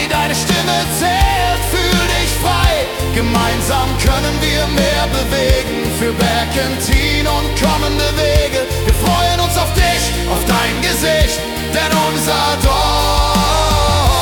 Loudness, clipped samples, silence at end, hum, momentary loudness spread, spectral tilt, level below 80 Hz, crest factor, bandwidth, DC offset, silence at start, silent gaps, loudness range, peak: -14 LUFS; under 0.1%; 0 s; none; 3 LU; -4 dB/octave; -20 dBFS; 14 dB; 19 kHz; under 0.1%; 0 s; none; 1 LU; 0 dBFS